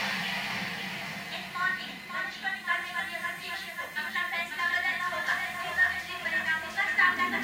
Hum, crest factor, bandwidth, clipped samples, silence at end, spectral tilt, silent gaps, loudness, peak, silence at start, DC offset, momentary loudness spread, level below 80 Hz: none; 20 dB; 16 kHz; under 0.1%; 0 s; -2 dB/octave; none; -30 LUFS; -12 dBFS; 0 s; under 0.1%; 10 LU; -66 dBFS